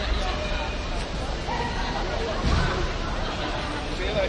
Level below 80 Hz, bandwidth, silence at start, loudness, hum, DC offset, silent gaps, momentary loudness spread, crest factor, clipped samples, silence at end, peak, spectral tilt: -30 dBFS; 10.5 kHz; 0 s; -28 LUFS; none; under 0.1%; none; 6 LU; 16 dB; under 0.1%; 0 s; -10 dBFS; -5 dB/octave